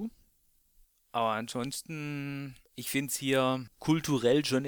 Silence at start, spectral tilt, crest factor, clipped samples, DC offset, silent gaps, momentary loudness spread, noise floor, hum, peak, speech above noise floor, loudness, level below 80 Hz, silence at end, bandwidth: 0 s; -4.5 dB/octave; 18 dB; under 0.1%; under 0.1%; none; 13 LU; -69 dBFS; none; -14 dBFS; 38 dB; -31 LUFS; -64 dBFS; 0 s; over 20 kHz